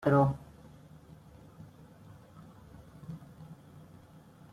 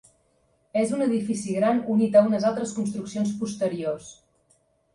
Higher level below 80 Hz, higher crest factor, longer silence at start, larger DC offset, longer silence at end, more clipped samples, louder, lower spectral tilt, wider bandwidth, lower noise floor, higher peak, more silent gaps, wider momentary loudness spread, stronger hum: about the same, -62 dBFS vs -66 dBFS; about the same, 22 dB vs 18 dB; second, 0 s vs 0.75 s; neither; first, 1 s vs 0.8 s; neither; second, -32 LUFS vs -24 LUFS; first, -9.5 dB/octave vs -6.5 dB/octave; about the same, 11 kHz vs 11.5 kHz; second, -55 dBFS vs -66 dBFS; second, -14 dBFS vs -6 dBFS; neither; first, 24 LU vs 11 LU; neither